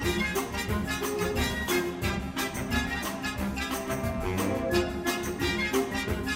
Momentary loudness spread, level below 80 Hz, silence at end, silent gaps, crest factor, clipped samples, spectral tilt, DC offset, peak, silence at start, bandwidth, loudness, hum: 4 LU; -40 dBFS; 0 s; none; 16 dB; under 0.1%; -4.5 dB/octave; under 0.1%; -12 dBFS; 0 s; 16 kHz; -29 LUFS; none